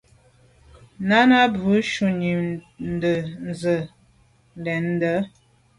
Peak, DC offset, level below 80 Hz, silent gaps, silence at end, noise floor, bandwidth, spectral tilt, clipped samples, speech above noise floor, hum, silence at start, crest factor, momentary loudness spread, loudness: -4 dBFS; under 0.1%; -54 dBFS; none; 0.5 s; -58 dBFS; 11.5 kHz; -6.5 dB/octave; under 0.1%; 37 dB; none; 1 s; 20 dB; 15 LU; -22 LUFS